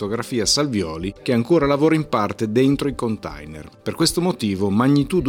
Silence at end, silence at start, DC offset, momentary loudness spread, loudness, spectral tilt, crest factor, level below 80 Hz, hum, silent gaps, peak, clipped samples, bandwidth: 0 s; 0 s; under 0.1%; 13 LU; -20 LUFS; -5 dB/octave; 16 dB; -44 dBFS; none; none; -4 dBFS; under 0.1%; 17 kHz